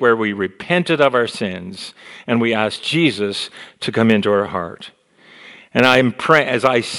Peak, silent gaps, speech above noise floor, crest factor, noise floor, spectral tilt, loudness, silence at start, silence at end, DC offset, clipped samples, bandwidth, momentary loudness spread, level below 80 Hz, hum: 0 dBFS; none; 28 dB; 18 dB; -46 dBFS; -5 dB/octave; -17 LUFS; 0 s; 0 s; under 0.1%; 0.1%; 13.5 kHz; 16 LU; -58 dBFS; none